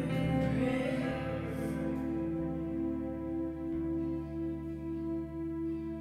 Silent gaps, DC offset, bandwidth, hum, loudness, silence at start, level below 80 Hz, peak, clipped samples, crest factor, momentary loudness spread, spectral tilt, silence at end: none; under 0.1%; 13.5 kHz; none; -35 LUFS; 0 s; -48 dBFS; -20 dBFS; under 0.1%; 14 dB; 7 LU; -8 dB/octave; 0 s